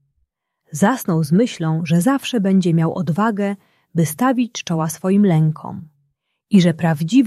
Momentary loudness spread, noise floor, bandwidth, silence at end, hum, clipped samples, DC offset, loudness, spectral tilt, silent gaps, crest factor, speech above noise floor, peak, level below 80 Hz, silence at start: 9 LU; -69 dBFS; 14 kHz; 0 s; none; under 0.1%; under 0.1%; -18 LUFS; -6.5 dB/octave; none; 16 dB; 52 dB; -2 dBFS; -60 dBFS; 0.7 s